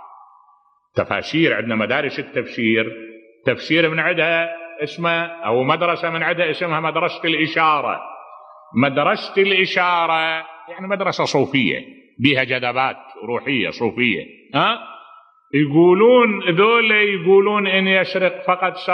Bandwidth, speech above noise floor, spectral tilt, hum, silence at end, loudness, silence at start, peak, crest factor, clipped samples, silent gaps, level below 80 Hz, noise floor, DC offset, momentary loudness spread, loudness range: 8.2 kHz; 39 dB; -6 dB/octave; none; 0 s; -18 LUFS; 0 s; 0 dBFS; 18 dB; under 0.1%; none; -64 dBFS; -57 dBFS; under 0.1%; 11 LU; 5 LU